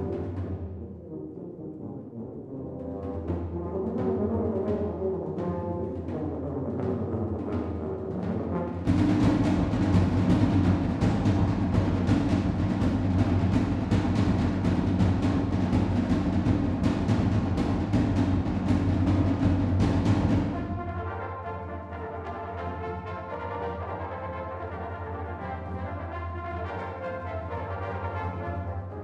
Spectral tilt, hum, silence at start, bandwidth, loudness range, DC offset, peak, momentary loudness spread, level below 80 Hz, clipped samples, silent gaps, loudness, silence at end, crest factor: -8.5 dB/octave; none; 0 s; 9 kHz; 10 LU; under 0.1%; -10 dBFS; 12 LU; -40 dBFS; under 0.1%; none; -28 LUFS; 0 s; 18 dB